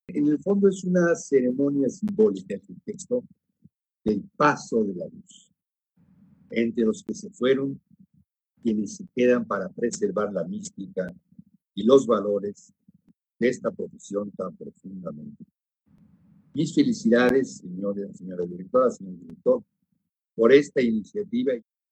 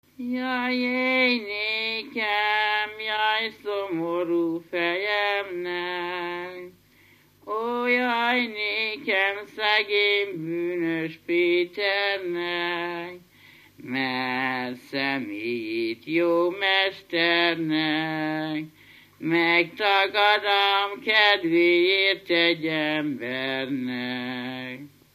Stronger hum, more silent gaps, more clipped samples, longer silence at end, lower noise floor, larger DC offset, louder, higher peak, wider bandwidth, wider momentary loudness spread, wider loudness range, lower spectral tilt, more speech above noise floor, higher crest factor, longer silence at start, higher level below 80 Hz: second, none vs 50 Hz at -65 dBFS; neither; neither; about the same, 0.3 s vs 0.3 s; first, -77 dBFS vs -57 dBFS; neither; about the same, -25 LUFS vs -24 LUFS; about the same, -4 dBFS vs -6 dBFS; second, 9 kHz vs 15 kHz; first, 17 LU vs 11 LU; about the same, 6 LU vs 7 LU; about the same, -6 dB/octave vs -5 dB/octave; first, 53 dB vs 33 dB; about the same, 22 dB vs 20 dB; about the same, 0.1 s vs 0.2 s; first, -66 dBFS vs -74 dBFS